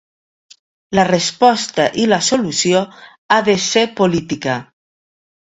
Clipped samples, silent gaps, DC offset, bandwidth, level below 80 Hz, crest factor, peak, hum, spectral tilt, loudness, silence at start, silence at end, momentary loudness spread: under 0.1%; 3.18-3.29 s; under 0.1%; 8.4 kHz; -54 dBFS; 16 dB; 0 dBFS; none; -3.5 dB/octave; -15 LUFS; 0.9 s; 0.95 s; 7 LU